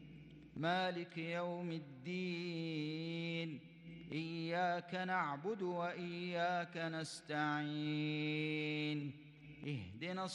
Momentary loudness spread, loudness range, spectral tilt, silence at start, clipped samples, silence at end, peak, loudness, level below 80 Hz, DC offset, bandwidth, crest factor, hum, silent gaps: 9 LU; 3 LU; -6 dB/octave; 0 s; under 0.1%; 0 s; -26 dBFS; -41 LUFS; -78 dBFS; under 0.1%; 10 kHz; 16 dB; none; none